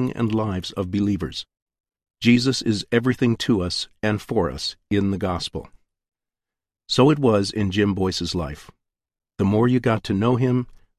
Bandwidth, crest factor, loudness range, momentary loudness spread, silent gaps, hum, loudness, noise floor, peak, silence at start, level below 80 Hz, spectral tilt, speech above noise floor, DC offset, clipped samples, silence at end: 13.5 kHz; 20 dB; 3 LU; 10 LU; 1.62-1.66 s, 6.08-6.12 s; none; -22 LUFS; -89 dBFS; -4 dBFS; 0 s; -44 dBFS; -6 dB/octave; 68 dB; under 0.1%; under 0.1%; 0.25 s